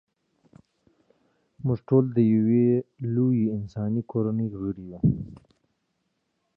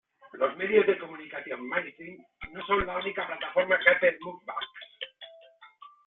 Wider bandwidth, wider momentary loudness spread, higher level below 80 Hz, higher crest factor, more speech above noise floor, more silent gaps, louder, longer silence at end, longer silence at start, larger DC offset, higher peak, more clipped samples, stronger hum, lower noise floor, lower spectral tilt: first, 5 kHz vs 4.1 kHz; second, 12 LU vs 21 LU; about the same, -54 dBFS vs -56 dBFS; second, 18 dB vs 24 dB; first, 52 dB vs 26 dB; neither; about the same, -25 LUFS vs -27 LUFS; first, 1.2 s vs 0.2 s; first, 1.65 s vs 0.25 s; neither; about the same, -8 dBFS vs -6 dBFS; neither; neither; first, -76 dBFS vs -55 dBFS; first, -12.5 dB/octave vs -7.5 dB/octave